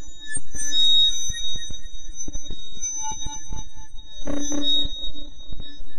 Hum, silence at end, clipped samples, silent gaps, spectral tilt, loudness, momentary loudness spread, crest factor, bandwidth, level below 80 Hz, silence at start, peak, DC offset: none; 0 s; under 0.1%; none; -1 dB/octave; -23 LUFS; 23 LU; 10 dB; 13 kHz; -36 dBFS; 0 s; -8 dBFS; under 0.1%